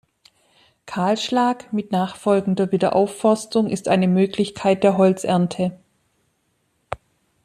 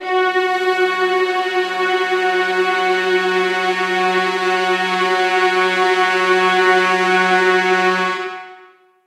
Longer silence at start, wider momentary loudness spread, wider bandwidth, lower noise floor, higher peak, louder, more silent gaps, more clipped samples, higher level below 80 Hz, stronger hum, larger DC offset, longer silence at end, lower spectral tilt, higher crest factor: first, 0.85 s vs 0 s; first, 9 LU vs 4 LU; about the same, 12.5 kHz vs 13 kHz; first, -68 dBFS vs -47 dBFS; about the same, -4 dBFS vs -4 dBFS; second, -20 LUFS vs -16 LUFS; neither; neither; first, -60 dBFS vs -86 dBFS; neither; neither; about the same, 0.5 s vs 0.5 s; first, -6.5 dB/octave vs -3.5 dB/octave; about the same, 18 dB vs 14 dB